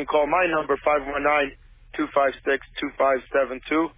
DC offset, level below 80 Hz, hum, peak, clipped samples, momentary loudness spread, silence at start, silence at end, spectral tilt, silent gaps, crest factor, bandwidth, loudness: under 0.1%; -50 dBFS; none; -8 dBFS; under 0.1%; 7 LU; 0 s; 0.05 s; -8 dB/octave; none; 14 dB; 3.9 kHz; -23 LUFS